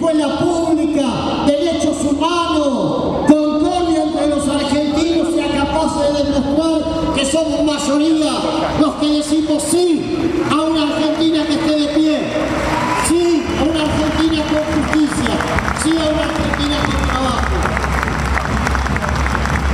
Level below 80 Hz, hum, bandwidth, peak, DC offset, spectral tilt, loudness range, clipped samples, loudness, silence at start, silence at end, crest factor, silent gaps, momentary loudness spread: -28 dBFS; none; 13.5 kHz; 0 dBFS; under 0.1%; -5 dB/octave; 1 LU; under 0.1%; -16 LUFS; 0 s; 0 s; 14 dB; none; 3 LU